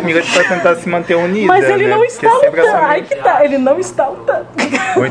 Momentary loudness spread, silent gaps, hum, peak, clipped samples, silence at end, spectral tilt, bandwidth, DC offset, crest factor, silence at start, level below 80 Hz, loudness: 6 LU; none; none; 0 dBFS; under 0.1%; 0 s; -4.5 dB/octave; 10 kHz; under 0.1%; 12 dB; 0 s; -54 dBFS; -12 LUFS